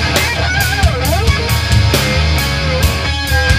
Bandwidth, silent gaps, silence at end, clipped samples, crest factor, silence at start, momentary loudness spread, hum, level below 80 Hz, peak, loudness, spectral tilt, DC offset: 16 kHz; none; 0 s; under 0.1%; 12 dB; 0 s; 2 LU; none; -20 dBFS; 0 dBFS; -13 LUFS; -4 dB/octave; under 0.1%